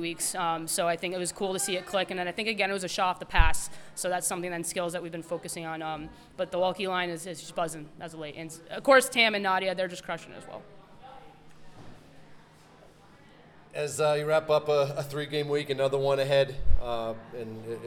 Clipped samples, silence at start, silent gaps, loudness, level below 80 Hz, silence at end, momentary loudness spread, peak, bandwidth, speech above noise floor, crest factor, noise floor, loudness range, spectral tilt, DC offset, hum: under 0.1%; 0 s; none; -29 LUFS; -40 dBFS; 0 s; 15 LU; -4 dBFS; 18 kHz; 27 dB; 24 dB; -55 dBFS; 7 LU; -3.5 dB/octave; under 0.1%; none